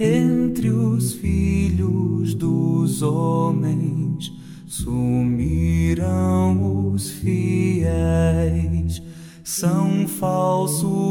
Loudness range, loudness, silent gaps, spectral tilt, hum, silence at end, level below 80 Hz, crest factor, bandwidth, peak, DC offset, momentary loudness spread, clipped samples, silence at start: 2 LU; -20 LUFS; none; -7 dB/octave; none; 0 s; -34 dBFS; 12 dB; 17.5 kHz; -6 dBFS; under 0.1%; 7 LU; under 0.1%; 0 s